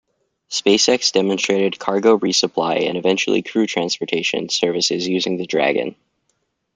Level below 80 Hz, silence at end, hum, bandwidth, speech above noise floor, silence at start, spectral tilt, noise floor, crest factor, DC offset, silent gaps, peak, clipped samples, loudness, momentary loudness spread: -64 dBFS; 0.8 s; none; 9.4 kHz; 51 dB; 0.5 s; -3 dB/octave; -70 dBFS; 18 dB; under 0.1%; none; -2 dBFS; under 0.1%; -18 LUFS; 6 LU